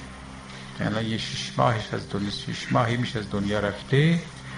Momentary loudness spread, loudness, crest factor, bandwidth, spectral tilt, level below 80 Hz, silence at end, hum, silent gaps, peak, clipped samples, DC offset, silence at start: 16 LU; -26 LUFS; 20 dB; 10.5 kHz; -6 dB/octave; -48 dBFS; 0 s; none; none; -6 dBFS; under 0.1%; under 0.1%; 0 s